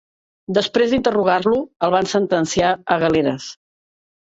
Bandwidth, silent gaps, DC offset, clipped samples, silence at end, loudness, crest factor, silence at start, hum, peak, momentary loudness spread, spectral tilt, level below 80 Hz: 8 kHz; 1.76-1.80 s; under 0.1%; under 0.1%; 0.7 s; -18 LUFS; 16 dB; 0.5 s; none; -2 dBFS; 5 LU; -5 dB/octave; -50 dBFS